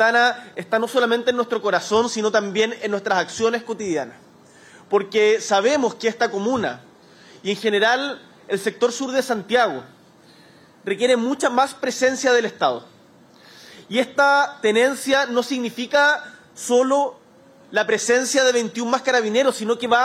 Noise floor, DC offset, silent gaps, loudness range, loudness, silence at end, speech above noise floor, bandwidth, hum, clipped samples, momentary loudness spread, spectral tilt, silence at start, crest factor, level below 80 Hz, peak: -50 dBFS; under 0.1%; none; 3 LU; -20 LUFS; 0 s; 31 dB; 15 kHz; none; under 0.1%; 9 LU; -3 dB/octave; 0 s; 16 dB; -68 dBFS; -4 dBFS